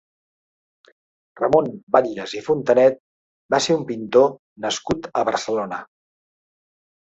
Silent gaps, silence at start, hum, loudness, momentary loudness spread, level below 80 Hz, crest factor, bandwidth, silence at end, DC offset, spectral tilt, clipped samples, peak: 1.83-1.87 s, 3.00-3.49 s, 4.39-4.56 s; 1.35 s; none; -20 LUFS; 12 LU; -56 dBFS; 20 dB; 8.2 kHz; 1.2 s; under 0.1%; -4.5 dB/octave; under 0.1%; -2 dBFS